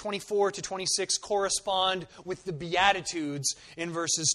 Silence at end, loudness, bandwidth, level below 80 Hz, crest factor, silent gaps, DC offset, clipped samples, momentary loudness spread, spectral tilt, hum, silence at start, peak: 0 s; -28 LUFS; 13 kHz; -62 dBFS; 22 dB; none; under 0.1%; under 0.1%; 11 LU; -2 dB/octave; none; 0 s; -8 dBFS